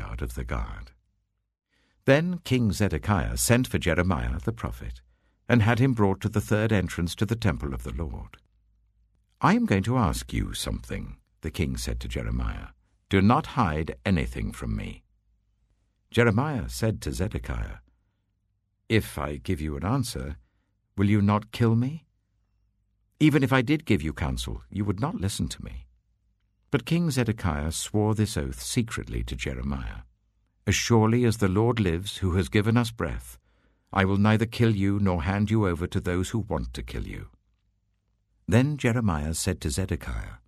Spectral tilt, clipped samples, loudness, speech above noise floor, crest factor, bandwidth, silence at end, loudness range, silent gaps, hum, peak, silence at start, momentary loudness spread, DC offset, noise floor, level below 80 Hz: -6 dB/octave; under 0.1%; -26 LUFS; 50 dB; 22 dB; 13.5 kHz; 0.1 s; 5 LU; none; none; -4 dBFS; 0 s; 13 LU; under 0.1%; -75 dBFS; -40 dBFS